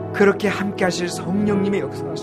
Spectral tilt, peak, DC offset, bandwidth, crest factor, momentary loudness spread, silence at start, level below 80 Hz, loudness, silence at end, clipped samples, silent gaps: -5.5 dB/octave; -4 dBFS; under 0.1%; 14.5 kHz; 16 dB; 7 LU; 0 s; -54 dBFS; -20 LUFS; 0 s; under 0.1%; none